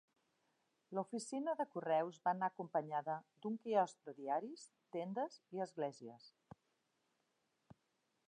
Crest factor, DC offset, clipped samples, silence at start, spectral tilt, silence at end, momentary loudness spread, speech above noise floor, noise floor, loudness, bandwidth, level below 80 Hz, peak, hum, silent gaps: 20 dB; under 0.1%; under 0.1%; 0.9 s; -5.5 dB/octave; 2 s; 14 LU; 42 dB; -84 dBFS; -42 LUFS; 10.5 kHz; under -90 dBFS; -24 dBFS; none; none